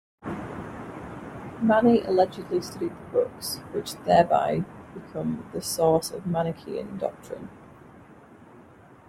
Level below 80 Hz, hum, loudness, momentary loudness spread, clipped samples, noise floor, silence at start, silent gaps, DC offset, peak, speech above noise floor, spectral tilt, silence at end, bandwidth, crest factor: -58 dBFS; none; -26 LUFS; 18 LU; under 0.1%; -51 dBFS; 0.25 s; none; under 0.1%; -6 dBFS; 26 dB; -5.5 dB/octave; 0.5 s; 16.5 kHz; 22 dB